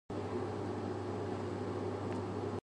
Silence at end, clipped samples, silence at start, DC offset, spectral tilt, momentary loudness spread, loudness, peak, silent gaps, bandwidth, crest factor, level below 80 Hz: 0.05 s; under 0.1%; 0.1 s; under 0.1%; -7.5 dB/octave; 1 LU; -40 LUFS; -28 dBFS; none; 10.5 kHz; 12 dB; -58 dBFS